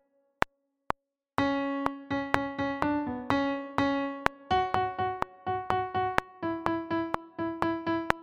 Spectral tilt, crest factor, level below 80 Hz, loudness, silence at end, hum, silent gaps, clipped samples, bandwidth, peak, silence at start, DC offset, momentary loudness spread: -6 dB/octave; 30 dB; -54 dBFS; -31 LUFS; 0 s; none; none; under 0.1%; 14.5 kHz; 0 dBFS; 0.4 s; under 0.1%; 6 LU